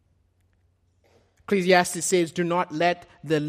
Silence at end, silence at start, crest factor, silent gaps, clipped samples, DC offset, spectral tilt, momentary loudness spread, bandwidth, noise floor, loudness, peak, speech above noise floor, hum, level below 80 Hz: 0 s; 1.5 s; 22 dB; none; under 0.1%; under 0.1%; -4 dB/octave; 7 LU; 15.5 kHz; -66 dBFS; -23 LUFS; -4 dBFS; 43 dB; none; -66 dBFS